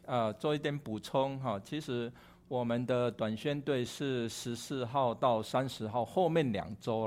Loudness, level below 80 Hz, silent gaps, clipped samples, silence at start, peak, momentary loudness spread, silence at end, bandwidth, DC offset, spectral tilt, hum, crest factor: -34 LUFS; -66 dBFS; none; under 0.1%; 0.05 s; -16 dBFS; 8 LU; 0 s; 16 kHz; under 0.1%; -6 dB/octave; none; 18 dB